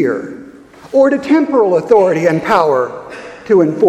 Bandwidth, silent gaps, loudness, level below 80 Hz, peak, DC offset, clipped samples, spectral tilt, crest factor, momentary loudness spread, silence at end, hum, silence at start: 12.5 kHz; none; -13 LUFS; -54 dBFS; 0 dBFS; under 0.1%; under 0.1%; -7 dB/octave; 12 dB; 19 LU; 0 s; none; 0 s